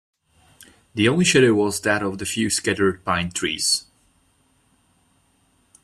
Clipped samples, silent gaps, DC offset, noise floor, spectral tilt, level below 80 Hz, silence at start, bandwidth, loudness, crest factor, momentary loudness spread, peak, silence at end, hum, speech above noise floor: under 0.1%; none; under 0.1%; -63 dBFS; -3.5 dB/octave; -56 dBFS; 0.95 s; 15 kHz; -20 LUFS; 20 dB; 8 LU; -4 dBFS; 2 s; none; 42 dB